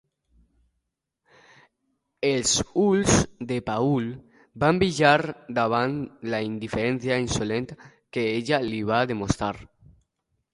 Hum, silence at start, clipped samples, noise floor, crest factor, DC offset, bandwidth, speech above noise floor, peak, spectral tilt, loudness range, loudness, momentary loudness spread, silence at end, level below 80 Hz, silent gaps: none; 2.2 s; under 0.1%; -80 dBFS; 22 dB; under 0.1%; 11.5 kHz; 56 dB; -4 dBFS; -4.5 dB/octave; 4 LU; -24 LUFS; 11 LU; 0.9 s; -48 dBFS; none